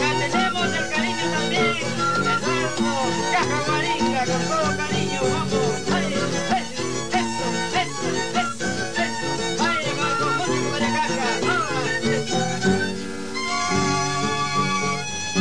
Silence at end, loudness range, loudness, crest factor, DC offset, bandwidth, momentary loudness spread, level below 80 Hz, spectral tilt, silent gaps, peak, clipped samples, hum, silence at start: 0 s; 2 LU; -22 LUFS; 14 dB; 2%; 10.5 kHz; 4 LU; -52 dBFS; -3.5 dB/octave; none; -8 dBFS; under 0.1%; none; 0 s